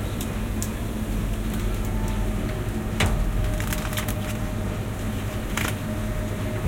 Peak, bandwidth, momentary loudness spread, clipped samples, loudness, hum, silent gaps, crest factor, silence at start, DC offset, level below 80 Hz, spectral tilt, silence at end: -8 dBFS; 17 kHz; 4 LU; under 0.1%; -28 LUFS; none; none; 18 dB; 0 s; under 0.1%; -30 dBFS; -5.5 dB/octave; 0 s